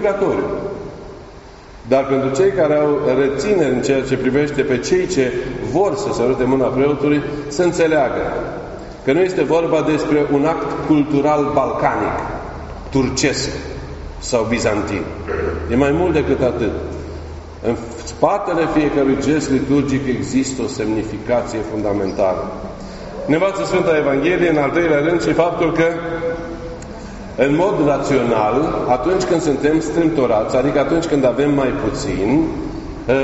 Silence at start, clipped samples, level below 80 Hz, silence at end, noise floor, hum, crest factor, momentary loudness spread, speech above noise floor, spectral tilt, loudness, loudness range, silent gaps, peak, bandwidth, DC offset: 0 s; under 0.1%; -36 dBFS; 0 s; -38 dBFS; none; 16 dB; 12 LU; 21 dB; -5.5 dB/octave; -17 LUFS; 3 LU; none; 0 dBFS; 8 kHz; under 0.1%